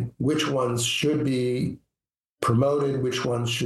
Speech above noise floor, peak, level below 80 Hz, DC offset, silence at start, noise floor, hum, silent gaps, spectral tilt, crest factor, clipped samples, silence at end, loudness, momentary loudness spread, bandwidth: over 66 dB; -8 dBFS; -56 dBFS; under 0.1%; 0 s; under -90 dBFS; none; 2.29-2.37 s; -5 dB/octave; 16 dB; under 0.1%; 0 s; -25 LUFS; 7 LU; 12.5 kHz